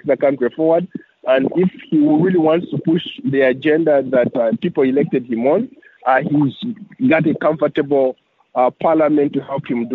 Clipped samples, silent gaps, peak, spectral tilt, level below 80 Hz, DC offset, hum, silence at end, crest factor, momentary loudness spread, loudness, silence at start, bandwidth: under 0.1%; none; -2 dBFS; -6 dB/octave; -62 dBFS; under 0.1%; none; 0 s; 14 dB; 7 LU; -17 LUFS; 0.05 s; 4.3 kHz